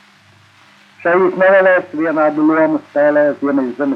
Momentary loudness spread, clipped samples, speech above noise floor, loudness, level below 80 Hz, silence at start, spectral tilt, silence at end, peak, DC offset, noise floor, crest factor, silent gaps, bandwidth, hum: 7 LU; under 0.1%; 35 dB; -13 LUFS; -74 dBFS; 1.05 s; -8 dB/octave; 0 s; -2 dBFS; under 0.1%; -48 dBFS; 14 dB; none; 5.8 kHz; none